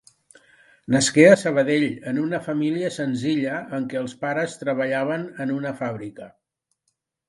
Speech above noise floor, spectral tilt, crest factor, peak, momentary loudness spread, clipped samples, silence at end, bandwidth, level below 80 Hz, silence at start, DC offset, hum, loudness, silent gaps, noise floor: 54 dB; -5 dB/octave; 22 dB; 0 dBFS; 14 LU; under 0.1%; 1 s; 11.5 kHz; -66 dBFS; 0.9 s; under 0.1%; none; -22 LUFS; none; -75 dBFS